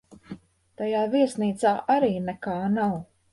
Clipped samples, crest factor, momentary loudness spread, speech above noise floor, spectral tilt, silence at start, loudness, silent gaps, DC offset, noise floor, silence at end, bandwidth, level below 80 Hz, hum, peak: under 0.1%; 16 dB; 21 LU; 20 dB; -6.5 dB/octave; 0.1 s; -25 LUFS; none; under 0.1%; -44 dBFS; 0.3 s; 11.5 kHz; -62 dBFS; none; -10 dBFS